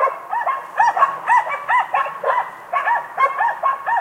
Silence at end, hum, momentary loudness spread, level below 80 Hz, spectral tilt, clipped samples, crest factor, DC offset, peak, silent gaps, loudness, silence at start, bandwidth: 0 s; none; 6 LU; -74 dBFS; -2 dB/octave; under 0.1%; 18 dB; under 0.1%; -2 dBFS; none; -19 LUFS; 0 s; 16 kHz